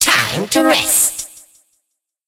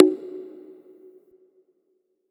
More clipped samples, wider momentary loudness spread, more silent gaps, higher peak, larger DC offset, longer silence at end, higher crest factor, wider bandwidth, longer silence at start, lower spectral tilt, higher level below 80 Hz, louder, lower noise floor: neither; second, 14 LU vs 25 LU; neither; about the same, 0 dBFS vs 0 dBFS; neither; second, 0.9 s vs 1.9 s; second, 18 dB vs 26 dB; first, 16 kHz vs 4.1 kHz; about the same, 0 s vs 0 s; second, -1.5 dB/octave vs -8.5 dB/octave; first, -50 dBFS vs under -90 dBFS; first, -13 LUFS vs -25 LUFS; about the same, -73 dBFS vs -71 dBFS